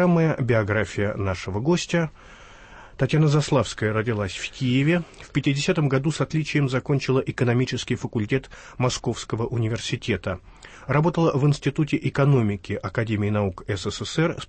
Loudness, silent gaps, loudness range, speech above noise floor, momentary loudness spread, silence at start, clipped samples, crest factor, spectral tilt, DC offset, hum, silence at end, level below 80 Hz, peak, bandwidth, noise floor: -24 LUFS; none; 3 LU; 22 dB; 8 LU; 0 s; under 0.1%; 14 dB; -6 dB/octave; under 0.1%; none; 0 s; -48 dBFS; -10 dBFS; 8.8 kHz; -45 dBFS